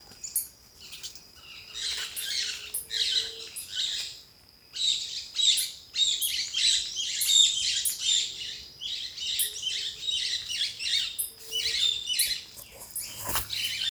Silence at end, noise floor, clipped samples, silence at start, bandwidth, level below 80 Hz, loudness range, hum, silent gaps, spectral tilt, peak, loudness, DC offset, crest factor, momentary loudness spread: 0 s; -56 dBFS; under 0.1%; 0 s; over 20 kHz; -60 dBFS; 7 LU; none; none; 2 dB/octave; -8 dBFS; -26 LUFS; under 0.1%; 22 dB; 17 LU